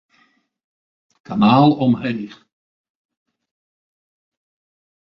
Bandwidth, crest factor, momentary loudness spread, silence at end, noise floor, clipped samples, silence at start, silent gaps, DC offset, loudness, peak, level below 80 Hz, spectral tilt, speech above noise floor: 6.2 kHz; 20 dB; 16 LU; 2.8 s; -61 dBFS; under 0.1%; 1.3 s; none; under 0.1%; -16 LUFS; -2 dBFS; -58 dBFS; -9 dB/octave; 45 dB